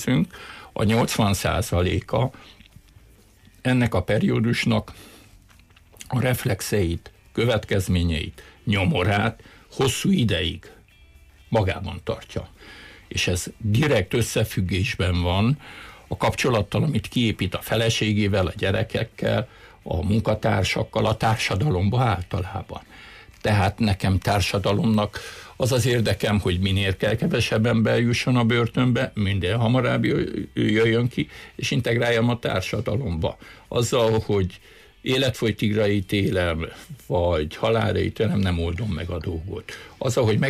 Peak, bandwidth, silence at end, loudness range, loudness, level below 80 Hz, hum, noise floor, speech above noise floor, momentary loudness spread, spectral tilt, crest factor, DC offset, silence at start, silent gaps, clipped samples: -10 dBFS; 15.5 kHz; 0 s; 4 LU; -23 LUFS; -42 dBFS; none; -53 dBFS; 30 dB; 11 LU; -5.5 dB/octave; 12 dB; under 0.1%; 0 s; none; under 0.1%